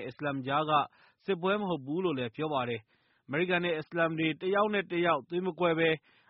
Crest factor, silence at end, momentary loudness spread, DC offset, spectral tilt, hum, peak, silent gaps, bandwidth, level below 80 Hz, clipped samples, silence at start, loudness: 18 dB; 0.3 s; 8 LU; under 0.1%; -4 dB/octave; none; -14 dBFS; none; 5.6 kHz; -72 dBFS; under 0.1%; 0 s; -31 LUFS